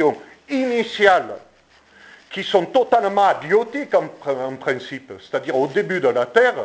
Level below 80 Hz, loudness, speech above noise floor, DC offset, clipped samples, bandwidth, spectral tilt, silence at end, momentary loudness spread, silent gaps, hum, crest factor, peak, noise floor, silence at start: -64 dBFS; -19 LUFS; 34 dB; under 0.1%; under 0.1%; 8 kHz; -5 dB/octave; 0 s; 14 LU; none; none; 20 dB; 0 dBFS; -53 dBFS; 0 s